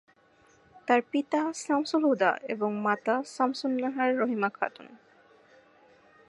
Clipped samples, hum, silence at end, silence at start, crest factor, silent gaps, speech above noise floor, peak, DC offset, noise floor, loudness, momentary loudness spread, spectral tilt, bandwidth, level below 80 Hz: under 0.1%; none; 1.3 s; 0.75 s; 20 dB; none; 34 dB; -8 dBFS; under 0.1%; -62 dBFS; -28 LUFS; 5 LU; -4.5 dB/octave; 11.5 kHz; -82 dBFS